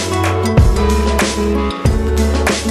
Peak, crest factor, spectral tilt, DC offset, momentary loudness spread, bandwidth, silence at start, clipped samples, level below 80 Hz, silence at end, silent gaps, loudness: 0 dBFS; 14 dB; -5.5 dB/octave; under 0.1%; 4 LU; 15 kHz; 0 s; under 0.1%; -18 dBFS; 0 s; none; -15 LUFS